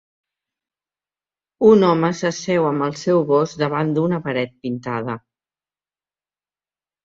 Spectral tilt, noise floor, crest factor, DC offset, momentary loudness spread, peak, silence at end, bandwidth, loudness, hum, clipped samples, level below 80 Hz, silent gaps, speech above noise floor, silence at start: -6.5 dB/octave; under -90 dBFS; 18 dB; under 0.1%; 12 LU; -2 dBFS; 1.85 s; 7.6 kHz; -19 LUFS; 50 Hz at -50 dBFS; under 0.1%; -60 dBFS; none; over 72 dB; 1.6 s